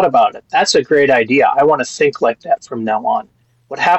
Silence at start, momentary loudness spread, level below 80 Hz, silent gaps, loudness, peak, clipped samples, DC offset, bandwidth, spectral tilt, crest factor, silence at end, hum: 0 s; 8 LU; -60 dBFS; none; -14 LUFS; -4 dBFS; under 0.1%; under 0.1%; 8.4 kHz; -3.5 dB/octave; 10 dB; 0 s; none